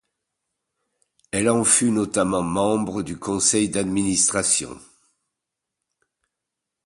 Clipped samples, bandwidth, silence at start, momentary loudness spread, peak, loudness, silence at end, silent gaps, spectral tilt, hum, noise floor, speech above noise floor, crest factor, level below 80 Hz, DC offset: under 0.1%; 11.5 kHz; 1.35 s; 11 LU; -4 dBFS; -20 LUFS; 2.1 s; none; -3.5 dB/octave; none; -84 dBFS; 62 dB; 20 dB; -54 dBFS; under 0.1%